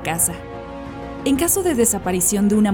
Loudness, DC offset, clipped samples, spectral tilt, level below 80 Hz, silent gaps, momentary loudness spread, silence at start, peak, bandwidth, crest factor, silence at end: -18 LUFS; under 0.1%; under 0.1%; -4 dB/octave; -42 dBFS; none; 16 LU; 0 s; -4 dBFS; over 20 kHz; 14 dB; 0 s